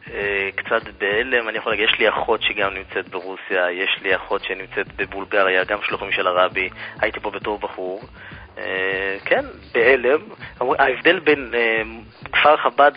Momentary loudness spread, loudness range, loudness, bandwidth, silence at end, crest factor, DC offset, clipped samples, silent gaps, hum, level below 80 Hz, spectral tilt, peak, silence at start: 12 LU; 5 LU; -20 LUFS; 5.2 kHz; 0 s; 20 dB; under 0.1%; under 0.1%; none; none; -50 dBFS; -8.5 dB/octave; 0 dBFS; 0.05 s